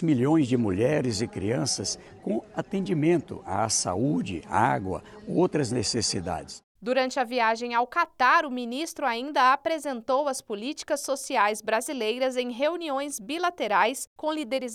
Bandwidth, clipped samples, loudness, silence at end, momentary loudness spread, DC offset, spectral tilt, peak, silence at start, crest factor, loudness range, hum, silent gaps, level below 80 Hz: 16 kHz; under 0.1%; -26 LUFS; 0 s; 9 LU; under 0.1%; -4 dB/octave; -8 dBFS; 0 s; 18 dB; 3 LU; none; 6.63-6.75 s, 14.07-14.16 s; -62 dBFS